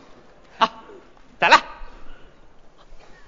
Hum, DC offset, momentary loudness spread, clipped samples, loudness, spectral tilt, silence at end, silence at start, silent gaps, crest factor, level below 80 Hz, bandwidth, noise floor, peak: none; 0.3%; 9 LU; under 0.1%; -18 LUFS; -2 dB/octave; 0.35 s; 0.6 s; none; 24 dB; -46 dBFS; 7.6 kHz; -49 dBFS; 0 dBFS